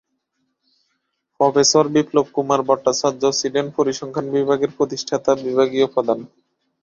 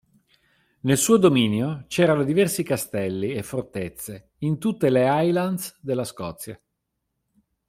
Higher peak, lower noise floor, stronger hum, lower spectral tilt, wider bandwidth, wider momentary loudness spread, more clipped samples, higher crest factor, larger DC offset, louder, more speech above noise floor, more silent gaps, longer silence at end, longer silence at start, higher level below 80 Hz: about the same, -2 dBFS vs -4 dBFS; second, -72 dBFS vs -79 dBFS; neither; second, -4 dB/octave vs -5.5 dB/octave; second, 7.6 kHz vs 16 kHz; second, 7 LU vs 15 LU; neither; about the same, 18 dB vs 18 dB; neither; first, -19 LUFS vs -22 LUFS; about the same, 54 dB vs 56 dB; neither; second, 0.55 s vs 1.15 s; first, 1.4 s vs 0.85 s; about the same, -60 dBFS vs -60 dBFS